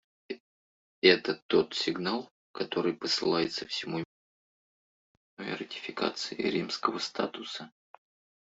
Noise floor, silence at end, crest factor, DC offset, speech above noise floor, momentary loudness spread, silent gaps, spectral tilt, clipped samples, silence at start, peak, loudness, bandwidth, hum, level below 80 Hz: under -90 dBFS; 0.75 s; 24 dB; under 0.1%; over 60 dB; 18 LU; 0.40-1.02 s, 1.42-1.49 s, 2.31-2.54 s, 4.05-5.37 s; -4 dB/octave; under 0.1%; 0.3 s; -8 dBFS; -30 LUFS; 8 kHz; none; -74 dBFS